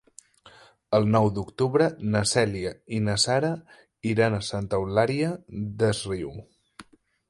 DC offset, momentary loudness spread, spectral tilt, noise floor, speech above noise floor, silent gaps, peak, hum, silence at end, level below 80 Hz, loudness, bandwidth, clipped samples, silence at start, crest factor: under 0.1%; 11 LU; -5 dB/octave; -54 dBFS; 29 dB; none; -6 dBFS; none; 0.5 s; -52 dBFS; -25 LUFS; 11.5 kHz; under 0.1%; 0.45 s; 20 dB